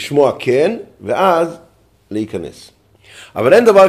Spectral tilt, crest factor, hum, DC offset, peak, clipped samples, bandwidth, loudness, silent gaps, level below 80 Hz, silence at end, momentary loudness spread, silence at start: -5.5 dB/octave; 14 dB; none; under 0.1%; 0 dBFS; under 0.1%; 15 kHz; -15 LUFS; none; -54 dBFS; 0 s; 16 LU; 0 s